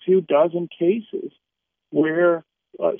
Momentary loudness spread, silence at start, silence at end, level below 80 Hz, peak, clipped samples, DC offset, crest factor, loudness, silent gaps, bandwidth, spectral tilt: 14 LU; 0.05 s; 0 s; -80 dBFS; -6 dBFS; under 0.1%; under 0.1%; 16 dB; -21 LUFS; none; 3.6 kHz; -6 dB/octave